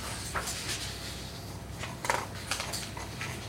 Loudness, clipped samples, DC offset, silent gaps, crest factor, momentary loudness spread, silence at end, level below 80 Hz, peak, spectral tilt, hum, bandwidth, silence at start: -35 LUFS; under 0.1%; under 0.1%; none; 28 dB; 8 LU; 0 s; -50 dBFS; -8 dBFS; -2.5 dB/octave; none; 16 kHz; 0 s